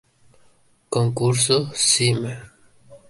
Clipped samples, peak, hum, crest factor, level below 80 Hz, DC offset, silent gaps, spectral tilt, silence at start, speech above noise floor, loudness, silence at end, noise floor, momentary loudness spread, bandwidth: under 0.1%; -4 dBFS; none; 20 dB; -56 dBFS; under 0.1%; none; -3.5 dB/octave; 0.9 s; 37 dB; -19 LUFS; 0.1 s; -57 dBFS; 12 LU; 12 kHz